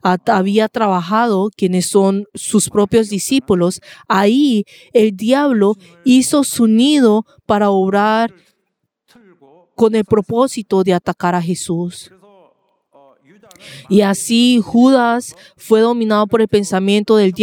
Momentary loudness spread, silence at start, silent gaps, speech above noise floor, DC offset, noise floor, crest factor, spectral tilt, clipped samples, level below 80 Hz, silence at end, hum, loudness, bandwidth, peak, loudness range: 7 LU; 0.05 s; none; 57 dB; under 0.1%; -71 dBFS; 14 dB; -5 dB/octave; under 0.1%; -54 dBFS; 0 s; none; -14 LUFS; 17.5 kHz; 0 dBFS; 5 LU